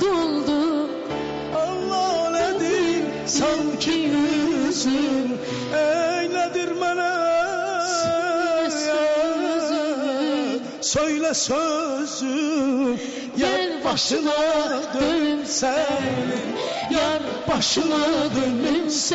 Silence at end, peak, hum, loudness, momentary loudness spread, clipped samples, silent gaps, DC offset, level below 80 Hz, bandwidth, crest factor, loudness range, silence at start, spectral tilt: 0 s; -12 dBFS; none; -22 LUFS; 5 LU; under 0.1%; none; under 0.1%; -54 dBFS; 8 kHz; 10 dB; 1 LU; 0 s; -2.5 dB/octave